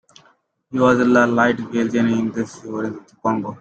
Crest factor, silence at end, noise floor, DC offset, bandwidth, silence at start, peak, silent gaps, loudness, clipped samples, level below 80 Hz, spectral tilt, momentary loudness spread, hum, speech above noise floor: 18 dB; 0.05 s; -58 dBFS; under 0.1%; 8.2 kHz; 0.7 s; -2 dBFS; none; -19 LUFS; under 0.1%; -58 dBFS; -6.5 dB/octave; 13 LU; none; 40 dB